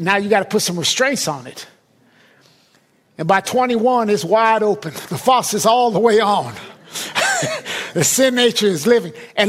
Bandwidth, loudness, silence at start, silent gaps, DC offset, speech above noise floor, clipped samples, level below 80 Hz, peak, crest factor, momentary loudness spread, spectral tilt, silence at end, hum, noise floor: 16 kHz; -16 LUFS; 0 s; none; under 0.1%; 40 dB; under 0.1%; -62 dBFS; -2 dBFS; 16 dB; 13 LU; -3 dB/octave; 0 s; none; -57 dBFS